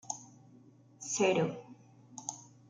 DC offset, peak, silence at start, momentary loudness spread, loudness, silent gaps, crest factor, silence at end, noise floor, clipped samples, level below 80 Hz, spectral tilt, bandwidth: under 0.1%; -16 dBFS; 0.05 s; 20 LU; -34 LUFS; none; 20 dB; 0.25 s; -60 dBFS; under 0.1%; -80 dBFS; -4 dB/octave; 10 kHz